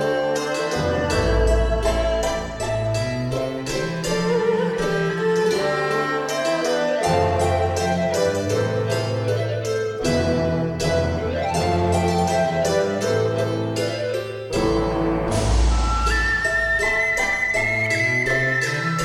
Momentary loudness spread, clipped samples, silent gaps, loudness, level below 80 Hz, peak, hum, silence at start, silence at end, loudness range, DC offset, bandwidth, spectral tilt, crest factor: 5 LU; under 0.1%; none; -21 LUFS; -30 dBFS; -8 dBFS; none; 0 s; 0 s; 3 LU; under 0.1%; 16 kHz; -5 dB/octave; 14 dB